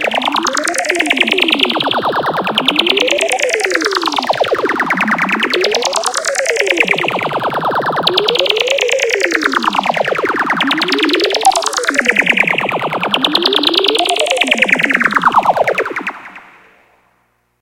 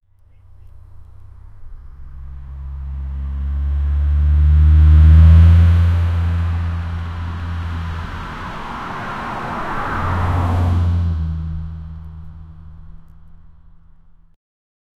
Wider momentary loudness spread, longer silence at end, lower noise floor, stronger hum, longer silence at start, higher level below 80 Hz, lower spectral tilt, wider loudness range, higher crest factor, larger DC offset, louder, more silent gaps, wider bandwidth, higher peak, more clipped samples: second, 5 LU vs 23 LU; second, 1.2 s vs 1.7 s; first, -60 dBFS vs -46 dBFS; neither; second, 0 s vs 0.65 s; second, -54 dBFS vs -20 dBFS; second, -2 dB/octave vs -8.5 dB/octave; second, 2 LU vs 17 LU; about the same, 14 dB vs 16 dB; neither; first, -13 LUFS vs -16 LUFS; neither; first, 17.5 kHz vs 4.6 kHz; about the same, 0 dBFS vs 0 dBFS; neither